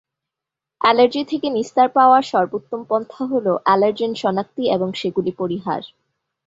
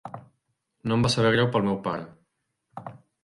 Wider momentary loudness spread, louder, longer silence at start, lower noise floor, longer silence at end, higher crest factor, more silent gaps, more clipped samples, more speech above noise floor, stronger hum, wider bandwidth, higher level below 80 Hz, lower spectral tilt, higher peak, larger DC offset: second, 10 LU vs 24 LU; first, -19 LUFS vs -24 LUFS; first, 0.8 s vs 0.05 s; first, -86 dBFS vs -77 dBFS; first, 0.6 s vs 0.25 s; about the same, 18 dB vs 20 dB; neither; neither; first, 68 dB vs 54 dB; neither; second, 7.8 kHz vs 11.5 kHz; second, -64 dBFS vs -56 dBFS; about the same, -6 dB/octave vs -5.5 dB/octave; first, -2 dBFS vs -8 dBFS; neither